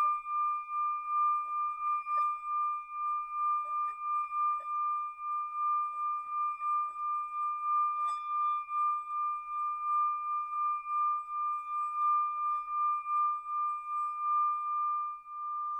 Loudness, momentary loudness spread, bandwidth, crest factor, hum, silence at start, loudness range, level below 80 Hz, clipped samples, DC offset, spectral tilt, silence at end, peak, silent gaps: -32 LUFS; 5 LU; 8.4 kHz; 10 dB; none; 0 s; 1 LU; -76 dBFS; under 0.1%; under 0.1%; -0.5 dB/octave; 0 s; -24 dBFS; none